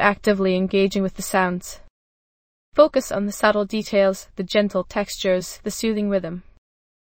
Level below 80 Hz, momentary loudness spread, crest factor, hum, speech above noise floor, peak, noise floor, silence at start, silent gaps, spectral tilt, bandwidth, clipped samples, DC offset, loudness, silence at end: -48 dBFS; 10 LU; 20 dB; none; over 69 dB; 0 dBFS; under -90 dBFS; 0 s; 1.90-2.72 s; -5 dB/octave; 17 kHz; under 0.1%; under 0.1%; -21 LUFS; 0.6 s